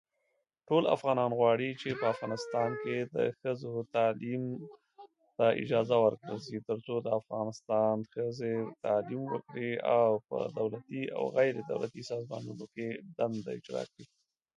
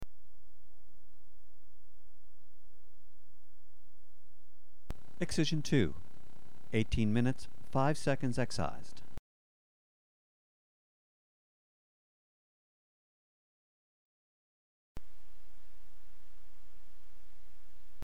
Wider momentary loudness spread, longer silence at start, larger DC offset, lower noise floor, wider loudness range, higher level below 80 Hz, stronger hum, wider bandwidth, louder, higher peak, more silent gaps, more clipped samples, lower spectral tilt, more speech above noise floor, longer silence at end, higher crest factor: second, 12 LU vs 25 LU; first, 0.7 s vs 0 s; neither; first, -80 dBFS vs -69 dBFS; second, 4 LU vs 9 LU; second, -76 dBFS vs -56 dBFS; neither; second, 10.5 kHz vs 19.5 kHz; about the same, -33 LUFS vs -34 LUFS; first, -12 dBFS vs -16 dBFS; second, none vs 9.19-14.95 s; neither; about the same, -6.5 dB/octave vs -6 dB/octave; first, 48 dB vs 41 dB; first, 0.5 s vs 0 s; about the same, 20 dB vs 18 dB